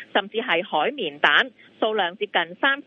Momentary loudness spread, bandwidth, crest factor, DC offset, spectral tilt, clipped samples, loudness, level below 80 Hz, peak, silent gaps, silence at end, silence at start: 8 LU; 7.4 kHz; 22 dB; under 0.1%; -4.5 dB/octave; under 0.1%; -22 LUFS; -76 dBFS; 0 dBFS; none; 0.05 s; 0 s